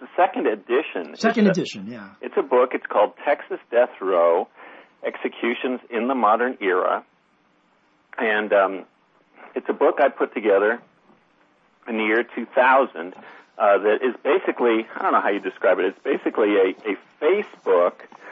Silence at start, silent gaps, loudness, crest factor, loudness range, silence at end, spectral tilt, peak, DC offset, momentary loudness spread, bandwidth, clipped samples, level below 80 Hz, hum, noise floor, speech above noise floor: 0 s; none; -21 LUFS; 18 dB; 3 LU; 0 s; -6 dB/octave; -4 dBFS; under 0.1%; 11 LU; 8 kHz; under 0.1%; -82 dBFS; none; -62 dBFS; 41 dB